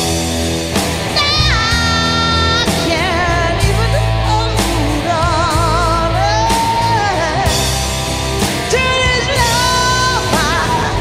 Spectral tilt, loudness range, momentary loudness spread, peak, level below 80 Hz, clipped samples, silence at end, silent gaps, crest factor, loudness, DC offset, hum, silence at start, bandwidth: -3.5 dB/octave; 1 LU; 4 LU; -2 dBFS; -24 dBFS; under 0.1%; 0 s; none; 12 dB; -13 LUFS; under 0.1%; none; 0 s; 16 kHz